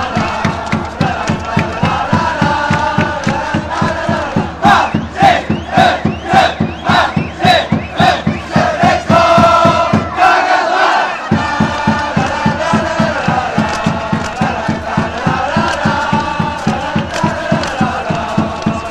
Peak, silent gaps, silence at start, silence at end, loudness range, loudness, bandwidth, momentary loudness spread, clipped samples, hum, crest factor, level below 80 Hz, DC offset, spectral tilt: 0 dBFS; none; 0 s; 0 s; 5 LU; -13 LUFS; 13 kHz; 7 LU; under 0.1%; none; 12 dB; -34 dBFS; under 0.1%; -5.5 dB/octave